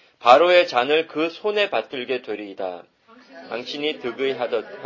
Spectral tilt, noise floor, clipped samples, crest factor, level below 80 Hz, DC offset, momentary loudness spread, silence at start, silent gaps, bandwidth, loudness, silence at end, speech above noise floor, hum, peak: -4 dB/octave; -46 dBFS; under 0.1%; 22 dB; -70 dBFS; under 0.1%; 17 LU; 0.2 s; none; 7.4 kHz; -21 LUFS; 0 s; 25 dB; none; 0 dBFS